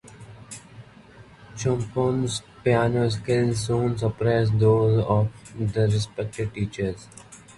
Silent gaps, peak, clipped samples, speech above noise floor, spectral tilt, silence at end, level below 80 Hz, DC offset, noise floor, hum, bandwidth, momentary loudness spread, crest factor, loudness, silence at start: none; -6 dBFS; under 0.1%; 26 dB; -6.5 dB/octave; 0.2 s; -48 dBFS; under 0.1%; -48 dBFS; none; 11.5 kHz; 20 LU; 18 dB; -24 LUFS; 0.05 s